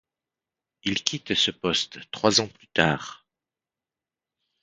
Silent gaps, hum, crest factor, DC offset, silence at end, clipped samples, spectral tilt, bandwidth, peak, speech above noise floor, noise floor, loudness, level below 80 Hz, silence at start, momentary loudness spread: none; none; 28 dB; under 0.1%; 1.45 s; under 0.1%; -3 dB/octave; 9.6 kHz; 0 dBFS; over 65 dB; under -90 dBFS; -24 LUFS; -58 dBFS; 0.85 s; 11 LU